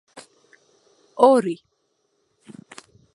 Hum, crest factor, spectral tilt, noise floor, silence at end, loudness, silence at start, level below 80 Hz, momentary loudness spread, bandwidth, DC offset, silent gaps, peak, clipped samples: none; 24 dB; -5.5 dB/octave; -71 dBFS; 1.6 s; -18 LUFS; 0.15 s; -76 dBFS; 27 LU; 11.5 kHz; under 0.1%; none; -2 dBFS; under 0.1%